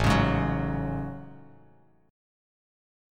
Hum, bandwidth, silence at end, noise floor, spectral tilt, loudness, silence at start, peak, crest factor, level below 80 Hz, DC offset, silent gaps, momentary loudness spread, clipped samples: none; 16 kHz; 1.7 s; -60 dBFS; -6.5 dB/octave; -28 LUFS; 0 s; -10 dBFS; 20 dB; -40 dBFS; under 0.1%; none; 19 LU; under 0.1%